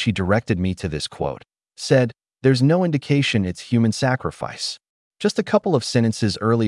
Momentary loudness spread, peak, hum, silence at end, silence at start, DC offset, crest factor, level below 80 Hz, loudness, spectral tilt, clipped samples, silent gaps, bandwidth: 10 LU; -4 dBFS; none; 0 s; 0 s; under 0.1%; 16 dB; -52 dBFS; -21 LUFS; -6 dB/octave; under 0.1%; 4.89-5.11 s; 12 kHz